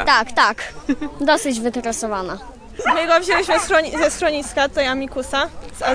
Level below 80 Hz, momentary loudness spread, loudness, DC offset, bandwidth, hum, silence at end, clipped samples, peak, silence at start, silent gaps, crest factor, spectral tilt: -42 dBFS; 10 LU; -19 LUFS; under 0.1%; 10.5 kHz; none; 0 s; under 0.1%; -2 dBFS; 0 s; none; 18 dB; -2.5 dB/octave